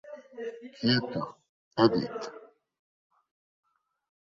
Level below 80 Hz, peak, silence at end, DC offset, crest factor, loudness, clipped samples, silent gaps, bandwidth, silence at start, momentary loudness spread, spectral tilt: -66 dBFS; -10 dBFS; 1.85 s; under 0.1%; 22 dB; -29 LUFS; under 0.1%; 1.49-1.71 s; 7.6 kHz; 0.05 s; 16 LU; -6.5 dB/octave